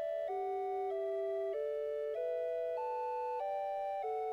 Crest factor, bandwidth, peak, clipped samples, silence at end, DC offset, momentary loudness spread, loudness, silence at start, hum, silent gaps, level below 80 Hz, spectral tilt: 8 dB; 8.6 kHz; -30 dBFS; under 0.1%; 0 s; under 0.1%; 1 LU; -38 LUFS; 0 s; none; none; -78 dBFS; -5 dB/octave